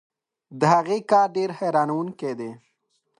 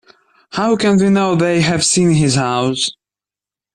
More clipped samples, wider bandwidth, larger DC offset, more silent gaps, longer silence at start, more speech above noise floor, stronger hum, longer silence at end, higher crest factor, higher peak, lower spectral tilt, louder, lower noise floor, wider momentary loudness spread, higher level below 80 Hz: neither; about the same, 11 kHz vs 11.5 kHz; neither; neither; about the same, 0.5 s vs 0.5 s; second, 50 dB vs 76 dB; neither; second, 0.65 s vs 0.85 s; first, 20 dB vs 12 dB; about the same, -4 dBFS vs -2 dBFS; first, -6.5 dB/octave vs -4.5 dB/octave; second, -22 LUFS vs -14 LUFS; second, -72 dBFS vs -89 dBFS; first, 11 LU vs 7 LU; second, -74 dBFS vs -50 dBFS